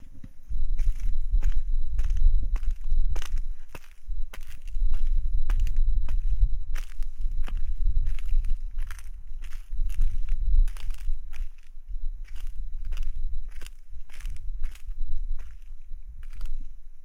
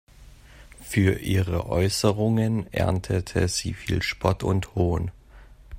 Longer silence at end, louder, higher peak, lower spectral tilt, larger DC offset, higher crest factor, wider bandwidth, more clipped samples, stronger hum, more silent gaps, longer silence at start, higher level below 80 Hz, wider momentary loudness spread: about the same, 0 s vs 0 s; second, -34 LUFS vs -25 LUFS; second, -10 dBFS vs -4 dBFS; about the same, -5.5 dB/octave vs -5.5 dB/octave; neither; second, 12 dB vs 20 dB; second, 3.2 kHz vs 16 kHz; neither; neither; neither; second, 0 s vs 0.2 s; first, -24 dBFS vs -42 dBFS; first, 15 LU vs 6 LU